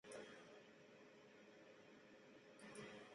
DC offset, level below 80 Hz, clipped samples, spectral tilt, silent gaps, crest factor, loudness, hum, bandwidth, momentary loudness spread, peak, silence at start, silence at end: under 0.1%; under -90 dBFS; under 0.1%; -3.5 dB/octave; none; 18 dB; -62 LUFS; none; 11 kHz; 8 LU; -44 dBFS; 0.05 s; 0 s